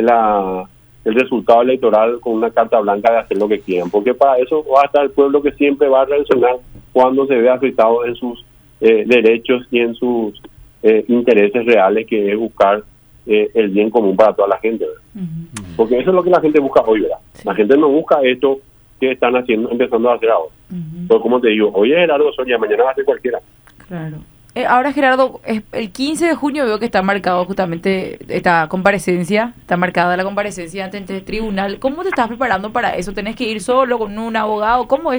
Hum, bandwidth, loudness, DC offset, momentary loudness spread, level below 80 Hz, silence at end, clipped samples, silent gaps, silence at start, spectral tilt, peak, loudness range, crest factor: none; over 20 kHz; -15 LUFS; under 0.1%; 11 LU; -46 dBFS; 0 s; under 0.1%; none; 0 s; -6 dB/octave; 0 dBFS; 4 LU; 14 dB